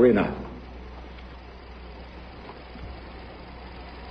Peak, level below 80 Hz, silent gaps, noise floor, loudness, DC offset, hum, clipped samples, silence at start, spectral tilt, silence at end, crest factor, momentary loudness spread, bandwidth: -6 dBFS; -44 dBFS; none; -43 dBFS; -33 LUFS; under 0.1%; none; under 0.1%; 0 s; -9 dB/octave; 0 s; 22 dB; 14 LU; 5.6 kHz